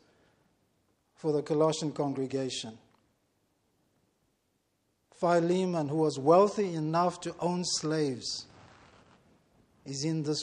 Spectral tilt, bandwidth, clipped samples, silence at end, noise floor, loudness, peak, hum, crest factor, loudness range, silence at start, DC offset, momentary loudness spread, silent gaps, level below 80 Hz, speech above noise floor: -5 dB/octave; 11 kHz; under 0.1%; 0 s; -76 dBFS; -30 LUFS; -10 dBFS; none; 22 dB; 8 LU; 1.25 s; under 0.1%; 12 LU; none; -74 dBFS; 47 dB